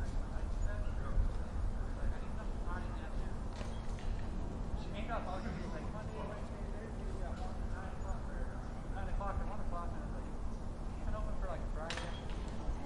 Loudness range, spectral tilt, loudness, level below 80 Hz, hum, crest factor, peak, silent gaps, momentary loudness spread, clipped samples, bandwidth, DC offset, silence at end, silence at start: 2 LU; -6.5 dB/octave; -43 LUFS; -40 dBFS; none; 16 dB; -22 dBFS; none; 4 LU; under 0.1%; 11 kHz; under 0.1%; 0 s; 0 s